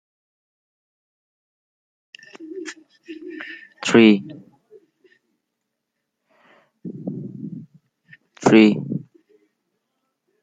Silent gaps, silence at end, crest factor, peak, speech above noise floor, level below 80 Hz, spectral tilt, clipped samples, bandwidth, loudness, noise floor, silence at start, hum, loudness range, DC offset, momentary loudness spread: none; 1.45 s; 22 dB; -2 dBFS; 65 dB; -68 dBFS; -5.5 dB/octave; under 0.1%; 9.2 kHz; -17 LUFS; -79 dBFS; 2.4 s; none; 18 LU; under 0.1%; 26 LU